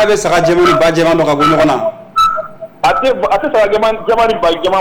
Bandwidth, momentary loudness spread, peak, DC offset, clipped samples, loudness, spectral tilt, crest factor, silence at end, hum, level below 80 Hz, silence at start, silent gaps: 19 kHz; 6 LU; -4 dBFS; under 0.1%; under 0.1%; -11 LUFS; -5 dB/octave; 6 dB; 0 s; none; -38 dBFS; 0 s; none